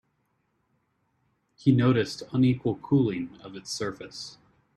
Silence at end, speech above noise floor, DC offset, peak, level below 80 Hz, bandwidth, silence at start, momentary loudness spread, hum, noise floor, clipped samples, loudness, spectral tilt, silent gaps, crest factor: 0.45 s; 48 dB; under 0.1%; -8 dBFS; -62 dBFS; 12 kHz; 1.65 s; 17 LU; none; -74 dBFS; under 0.1%; -26 LUFS; -6.5 dB/octave; none; 20 dB